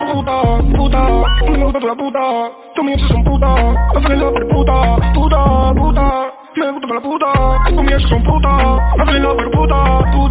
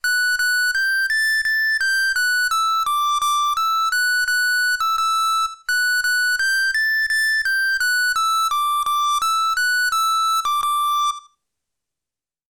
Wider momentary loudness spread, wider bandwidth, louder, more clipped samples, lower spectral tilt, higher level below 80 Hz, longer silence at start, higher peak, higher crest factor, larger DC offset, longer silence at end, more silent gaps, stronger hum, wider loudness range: first, 6 LU vs 2 LU; second, 4 kHz vs 19.5 kHz; first, -14 LUFS vs -18 LUFS; neither; first, -11 dB/octave vs 5 dB/octave; first, -14 dBFS vs -58 dBFS; about the same, 0 s vs 0.05 s; first, 0 dBFS vs -16 dBFS; first, 12 dB vs 4 dB; second, under 0.1% vs 0.5%; second, 0 s vs 1.3 s; neither; neither; about the same, 2 LU vs 1 LU